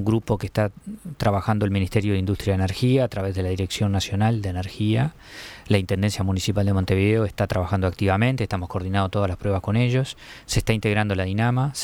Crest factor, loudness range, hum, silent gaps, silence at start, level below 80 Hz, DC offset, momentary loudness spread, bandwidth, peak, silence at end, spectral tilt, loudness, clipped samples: 16 dB; 1 LU; none; none; 0 s; -42 dBFS; under 0.1%; 6 LU; 16 kHz; -6 dBFS; 0 s; -6.5 dB/octave; -23 LUFS; under 0.1%